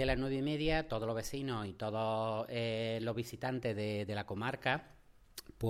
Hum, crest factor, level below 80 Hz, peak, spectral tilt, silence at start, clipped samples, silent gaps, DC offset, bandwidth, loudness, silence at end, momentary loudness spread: none; 20 dB; -52 dBFS; -16 dBFS; -6 dB/octave; 0 s; under 0.1%; none; under 0.1%; 16 kHz; -37 LUFS; 0 s; 5 LU